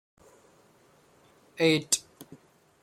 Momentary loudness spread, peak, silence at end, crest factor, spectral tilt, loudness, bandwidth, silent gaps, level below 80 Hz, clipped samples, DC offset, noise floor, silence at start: 27 LU; -8 dBFS; 0.6 s; 24 dB; -3 dB/octave; -26 LUFS; 16.5 kHz; none; -72 dBFS; under 0.1%; under 0.1%; -61 dBFS; 1.6 s